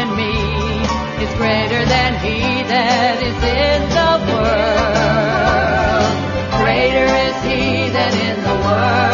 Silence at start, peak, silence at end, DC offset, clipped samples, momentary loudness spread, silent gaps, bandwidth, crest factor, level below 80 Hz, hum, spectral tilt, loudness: 0 s; -2 dBFS; 0 s; under 0.1%; under 0.1%; 4 LU; none; 7.4 kHz; 12 dB; -28 dBFS; none; -5.5 dB/octave; -15 LUFS